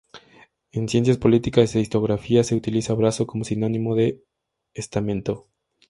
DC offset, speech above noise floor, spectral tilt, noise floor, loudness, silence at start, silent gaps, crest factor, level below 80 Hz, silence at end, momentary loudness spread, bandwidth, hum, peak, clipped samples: under 0.1%; 33 dB; -6.5 dB/octave; -54 dBFS; -22 LUFS; 0.15 s; none; 20 dB; -50 dBFS; 0.5 s; 12 LU; 11.5 kHz; none; -2 dBFS; under 0.1%